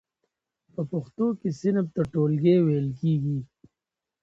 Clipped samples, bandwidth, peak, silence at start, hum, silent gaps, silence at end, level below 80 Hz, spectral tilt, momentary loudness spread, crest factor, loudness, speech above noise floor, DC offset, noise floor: under 0.1%; 7.6 kHz; -10 dBFS; 0.8 s; none; none; 0.75 s; -60 dBFS; -9.5 dB/octave; 11 LU; 16 dB; -25 LUFS; 64 dB; under 0.1%; -88 dBFS